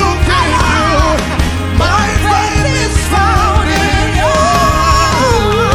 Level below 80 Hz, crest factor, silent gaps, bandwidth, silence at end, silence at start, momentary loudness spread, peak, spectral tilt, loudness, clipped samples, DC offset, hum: -18 dBFS; 10 dB; none; 15 kHz; 0 s; 0 s; 3 LU; 0 dBFS; -4.5 dB/octave; -11 LUFS; under 0.1%; under 0.1%; none